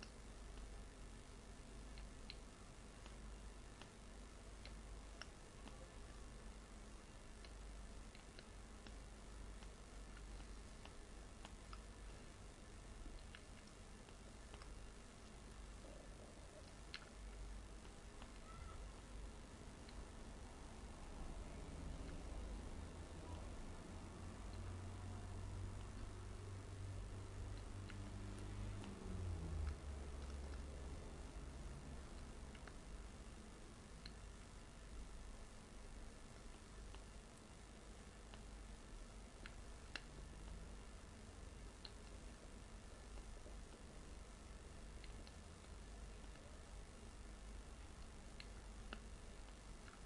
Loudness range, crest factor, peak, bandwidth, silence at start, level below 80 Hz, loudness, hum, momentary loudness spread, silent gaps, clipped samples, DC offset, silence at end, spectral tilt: 7 LU; 26 dB; -28 dBFS; 11.5 kHz; 0 s; -56 dBFS; -57 LUFS; none; 7 LU; none; under 0.1%; under 0.1%; 0 s; -5 dB/octave